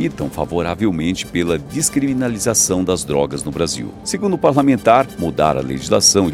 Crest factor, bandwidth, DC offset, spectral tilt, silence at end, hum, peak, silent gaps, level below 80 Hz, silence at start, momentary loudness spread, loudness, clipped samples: 16 dB; 16.5 kHz; under 0.1%; -4 dB/octave; 0 s; none; 0 dBFS; none; -40 dBFS; 0 s; 9 LU; -17 LUFS; under 0.1%